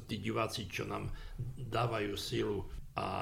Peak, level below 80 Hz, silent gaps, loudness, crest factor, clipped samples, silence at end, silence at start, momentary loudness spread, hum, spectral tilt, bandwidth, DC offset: -18 dBFS; -50 dBFS; none; -38 LUFS; 18 dB; under 0.1%; 0 s; 0 s; 9 LU; none; -5.5 dB/octave; 16 kHz; under 0.1%